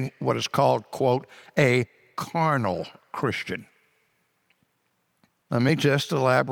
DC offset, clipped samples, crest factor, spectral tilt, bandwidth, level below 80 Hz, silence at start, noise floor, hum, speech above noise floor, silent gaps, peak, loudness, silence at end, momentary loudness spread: under 0.1%; under 0.1%; 20 dB; -6 dB/octave; 17.5 kHz; -66 dBFS; 0 s; -72 dBFS; none; 48 dB; none; -6 dBFS; -25 LUFS; 0 s; 12 LU